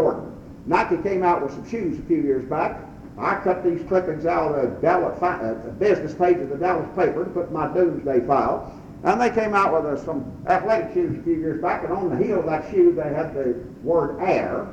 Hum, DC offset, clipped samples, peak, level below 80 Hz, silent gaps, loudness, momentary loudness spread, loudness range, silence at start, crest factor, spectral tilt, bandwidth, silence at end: none; under 0.1%; under 0.1%; -4 dBFS; -48 dBFS; none; -22 LUFS; 8 LU; 2 LU; 0 s; 18 dB; -8 dB/octave; 7.8 kHz; 0 s